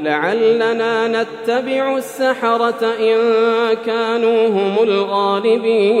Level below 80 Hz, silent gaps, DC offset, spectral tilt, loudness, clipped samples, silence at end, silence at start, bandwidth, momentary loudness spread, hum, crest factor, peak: -78 dBFS; none; under 0.1%; -5 dB/octave; -16 LUFS; under 0.1%; 0 s; 0 s; 14 kHz; 4 LU; none; 12 dB; -2 dBFS